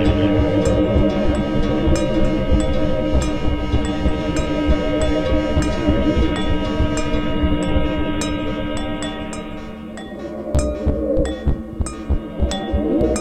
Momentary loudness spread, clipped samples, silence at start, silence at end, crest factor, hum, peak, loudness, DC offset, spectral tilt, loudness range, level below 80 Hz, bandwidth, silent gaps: 9 LU; under 0.1%; 0 s; 0 s; 16 dB; none; -2 dBFS; -20 LUFS; under 0.1%; -6.5 dB/octave; 5 LU; -24 dBFS; 10 kHz; none